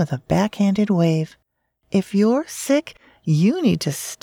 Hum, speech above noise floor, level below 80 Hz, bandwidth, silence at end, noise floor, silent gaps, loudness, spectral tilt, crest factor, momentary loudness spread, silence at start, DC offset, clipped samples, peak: none; 50 dB; -54 dBFS; 18 kHz; 0.1 s; -69 dBFS; none; -20 LUFS; -6.5 dB/octave; 14 dB; 6 LU; 0 s; under 0.1%; under 0.1%; -6 dBFS